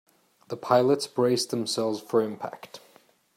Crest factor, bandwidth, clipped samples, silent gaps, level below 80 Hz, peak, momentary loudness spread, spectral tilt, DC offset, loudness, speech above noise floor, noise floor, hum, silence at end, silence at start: 22 dB; 16 kHz; under 0.1%; none; -76 dBFS; -6 dBFS; 17 LU; -4.5 dB/octave; under 0.1%; -25 LUFS; 34 dB; -60 dBFS; none; 0.6 s; 0.5 s